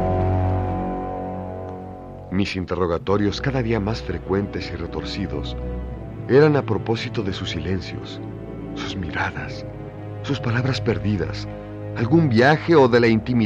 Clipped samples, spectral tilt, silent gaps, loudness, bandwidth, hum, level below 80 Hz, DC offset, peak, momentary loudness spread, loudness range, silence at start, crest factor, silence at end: under 0.1%; -7 dB/octave; none; -22 LUFS; 8 kHz; none; -38 dBFS; under 0.1%; -2 dBFS; 17 LU; 7 LU; 0 s; 20 dB; 0 s